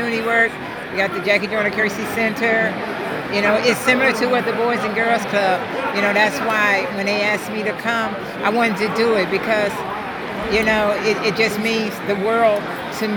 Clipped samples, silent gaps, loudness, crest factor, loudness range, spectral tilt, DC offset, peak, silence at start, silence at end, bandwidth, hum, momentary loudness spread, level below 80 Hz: under 0.1%; none; -18 LUFS; 16 dB; 2 LU; -4.5 dB/octave; under 0.1%; -2 dBFS; 0 s; 0 s; over 20 kHz; none; 7 LU; -50 dBFS